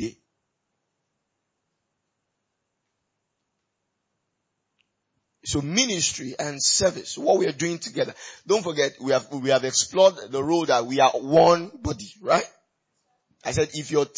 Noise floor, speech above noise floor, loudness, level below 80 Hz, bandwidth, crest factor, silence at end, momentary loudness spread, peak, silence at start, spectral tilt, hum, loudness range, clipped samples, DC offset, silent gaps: -79 dBFS; 56 dB; -22 LUFS; -54 dBFS; 8 kHz; 20 dB; 0.1 s; 13 LU; -6 dBFS; 0 s; -3 dB/octave; none; 7 LU; under 0.1%; under 0.1%; none